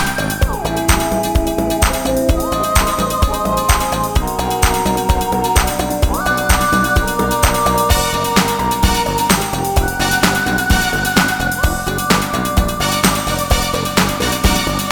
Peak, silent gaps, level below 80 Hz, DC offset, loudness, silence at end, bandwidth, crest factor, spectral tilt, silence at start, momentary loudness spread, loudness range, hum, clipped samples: 0 dBFS; none; -22 dBFS; under 0.1%; -15 LUFS; 0 s; 18 kHz; 16 dB; -4 dB/octave; 0 s; 4 LU; 1 LU; none; under 0.1%